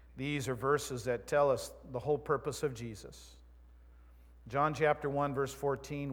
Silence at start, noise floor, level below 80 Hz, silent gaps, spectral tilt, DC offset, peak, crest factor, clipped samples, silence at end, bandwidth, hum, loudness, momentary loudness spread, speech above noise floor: 0 s; -57 dBFS; -58 dBFS; none; -5.5 dB/octave; under 0.1%; -16 dBFS; 20 dB; under 0.1%; 0 s; 19 kHz; none; -34 LUFS; 13 LU; 23 dB